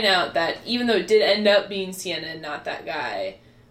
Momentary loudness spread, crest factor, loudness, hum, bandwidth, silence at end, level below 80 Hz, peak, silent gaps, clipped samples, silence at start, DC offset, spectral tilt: 13 LU; 16 dB; -22 LUFS; none; 14.5 kHz; 0.35 s; -60 dBFS; -6 dBFS; none; under 0.1%; 0 s; under 0.1%; -3.5 dB/octave